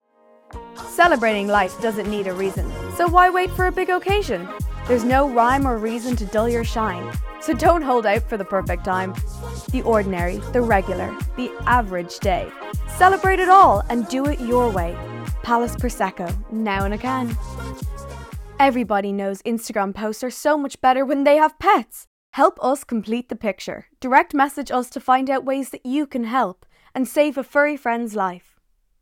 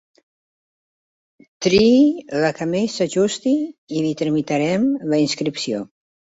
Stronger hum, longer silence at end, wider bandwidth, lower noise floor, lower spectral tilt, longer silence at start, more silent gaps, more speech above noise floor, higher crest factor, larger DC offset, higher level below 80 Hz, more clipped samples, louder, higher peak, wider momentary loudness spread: neither; first, 0.65 s vs 0.5 s; first, 18 kHz vs 8 kHz; second, -63 dBFS vs under -90 dBFS; about the same, -5.5 dB/octave vs -5 dB/octave; second, 0.55 s vs 1.6 s; first, 22.07-22.33 s vs 3.78-3.87 s; second, 43 dB vs over 72 dB; about the same, 18 dB vs 16 dB; neither; first, -34 dBFS vs -54 dBFS; neither; about the same, -20 LUFS vs -19 LUFS; about the same, -2 dBFS vs -4 dBFS; first, 14 LU vs 10 LU